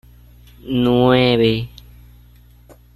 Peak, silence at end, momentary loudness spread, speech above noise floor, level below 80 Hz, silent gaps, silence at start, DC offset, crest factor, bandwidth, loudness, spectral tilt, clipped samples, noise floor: -2 dBFS; 1.3 s; 11 LU; 31 dB; -42 dBFS; none; 0.65 s; under 0.1%; 18 dB; 12 kHz; -16 LUFS; -7.5 dB/octave; under 0.1%; -46 dBFS